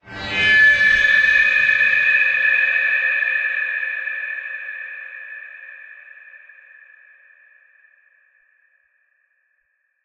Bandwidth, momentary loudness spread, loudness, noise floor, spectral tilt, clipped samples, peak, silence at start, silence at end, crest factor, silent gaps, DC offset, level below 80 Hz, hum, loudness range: 8.4 kHz; 22 LU; -15 LUFS; -69 dBFS; -2 dB/octave; under 0.1%; -4 dBFS; 0.05 s; 3.65 s; 16 dB; none; under 0.1%; -54 dBFS; none; 22 LU